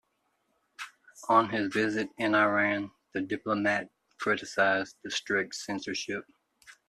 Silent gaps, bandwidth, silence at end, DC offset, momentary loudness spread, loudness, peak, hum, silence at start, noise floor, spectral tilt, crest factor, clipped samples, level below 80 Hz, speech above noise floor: none; 13 kHz; 0.15 s; under 0.1%; 15 LU; -29 LUFS; -8 dBFS; none; 0.8 s; -76 dBFS; -4 dB/octave; 22 dB; under 0.1%; -72 dBFS; 47 dB